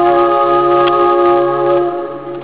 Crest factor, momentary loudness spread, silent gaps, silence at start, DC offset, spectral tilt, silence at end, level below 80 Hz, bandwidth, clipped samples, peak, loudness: 8 dB; 8 LU; none; 0 s; 0.6%; -9.5 dB/octave; 0 s; -50 dBFS; 4 kHz; under 0.1%; -4 dBFS; -11 LUFS